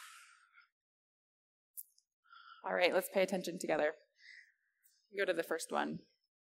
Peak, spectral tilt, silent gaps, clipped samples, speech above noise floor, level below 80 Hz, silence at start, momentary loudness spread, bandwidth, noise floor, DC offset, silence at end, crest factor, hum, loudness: -16 dBFS; -3.5 dB/octave; 0.72-1.74 s, 2.13-2.23 s; under 0.1%; 39 dB; under -90 dBFS; 0 s; 25 LU; 16 kHz; -75 dBFS; under 0.1%; 0.5 s; 24 dB; none; -36 LUFS